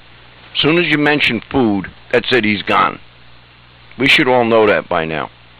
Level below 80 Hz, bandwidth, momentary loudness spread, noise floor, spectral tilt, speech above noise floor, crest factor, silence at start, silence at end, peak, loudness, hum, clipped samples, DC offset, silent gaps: -48 dBFS; 15.5 kHz; 10 LU; -43 dBFS; -5.5 dB/octave; 29 dB; 16 dB; 0.55 s; 0.3 s; 0 dBFS; -14 LUFS; 60 Hz at -50 dBFS; under 0.1%; under 0.1%; none